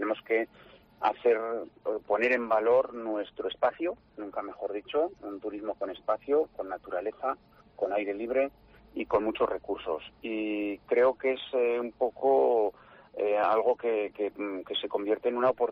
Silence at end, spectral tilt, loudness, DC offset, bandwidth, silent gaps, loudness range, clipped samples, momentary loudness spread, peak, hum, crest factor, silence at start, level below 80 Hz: 0 s; -6.5 dB/octave; -30 LUFS; under 0.1%; 5.4 kHz; none; 5 LU; under 0.1%; 11 LU; -14 dBFS; none; 14 dB; 0 s; -66 dBFS